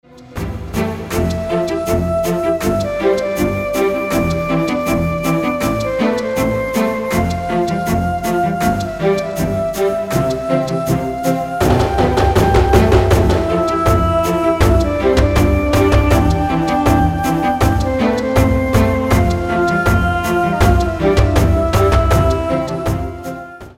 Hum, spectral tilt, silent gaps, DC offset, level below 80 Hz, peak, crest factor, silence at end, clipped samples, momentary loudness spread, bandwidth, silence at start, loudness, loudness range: none; -6.5 dB/octave; none; 0.2%; -24 dBFS; 0 dBFS; 14 dB; 0.05 s; under 0.1%; 6 LU; 16.5 kHz; 0.15 s; -15 LUFS; 4 LU